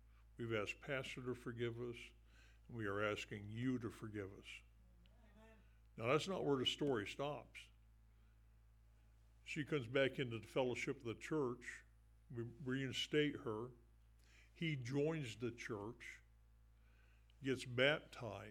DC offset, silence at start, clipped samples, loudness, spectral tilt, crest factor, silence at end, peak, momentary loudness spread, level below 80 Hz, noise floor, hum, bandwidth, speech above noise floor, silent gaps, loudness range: under 0.1%; 0.05 s; under 0.1%; -43 LUFS; -5.5 dB/octave; 24 dB; 0 s; -22 dBFS; 17 LU; -68 dBFS; -68 dBFS; none; 16 kHz; 25 dB; none; 4 LU